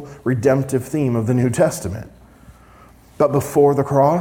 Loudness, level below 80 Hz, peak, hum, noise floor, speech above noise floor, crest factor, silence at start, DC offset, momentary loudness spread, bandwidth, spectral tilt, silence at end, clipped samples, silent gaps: -18 LUFS; -50 dBFS; -4 dBFS; none; -46 dBFS; 29 dB; 16 dB; 0 s; under 0.1%; 8 LU; 18 kHz; -7.5 dB/octave; 0 s; under 0.1%; none